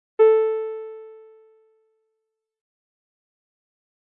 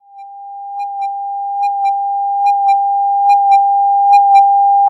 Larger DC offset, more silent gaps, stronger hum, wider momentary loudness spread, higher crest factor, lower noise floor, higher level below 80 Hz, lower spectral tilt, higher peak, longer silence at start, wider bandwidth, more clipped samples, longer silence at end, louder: neither; neither; neither; first, 22 LU vs 15 LU; first, 20 dB vs 10 dB; first, -80 dBFS vs -33 dBFS; about the same, under -90 dBFS vs -86 dBFS; first, -5.5 dB/octave vs 1.5 dB/octave; second, -6 dBFS vs -2 dBFS; about the same, 0.2 s vs 0.15 s; second, 3.7 kHz vs 7.6 kHz; neither; first, 3 s vs 0 s; second, -20 LUFS vs -12 LUFS